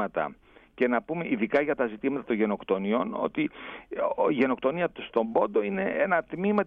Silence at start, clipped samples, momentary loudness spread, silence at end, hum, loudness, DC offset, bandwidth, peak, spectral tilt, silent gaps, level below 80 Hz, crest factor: 0 s; under 0.1%; 6 LU; 0 s; none; -28 LUFS; under 0.1%; 5.4 kHz; -10 dBFS; -9 dB/octave; none; -62 dBFS; 18 dB